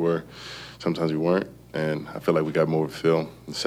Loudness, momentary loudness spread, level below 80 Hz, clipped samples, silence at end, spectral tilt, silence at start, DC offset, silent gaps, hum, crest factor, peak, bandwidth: -26 LUFS; 10 LU; -58 dBFS; under 0.1%; 0 s; -6.5 dB/octave; 0 s; under 0.1%; none; none; 18 dB; -6 dBFS; 15.5 kHz